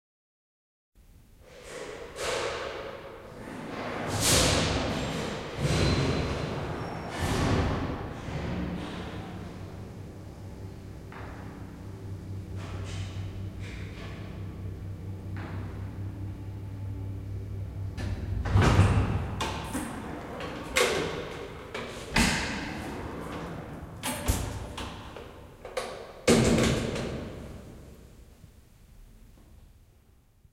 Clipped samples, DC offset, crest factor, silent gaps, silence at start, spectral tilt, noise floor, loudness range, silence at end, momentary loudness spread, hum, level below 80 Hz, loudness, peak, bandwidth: under 0.1%; under 0.1%; 24 dB; none; 0.95 s; -4.5 dB/octave; -60 dBFS; 12 LU; 0.7 s; 18 LU; none; -42 dBFS; -31 LUFS; -8 dBFS; 16 kHz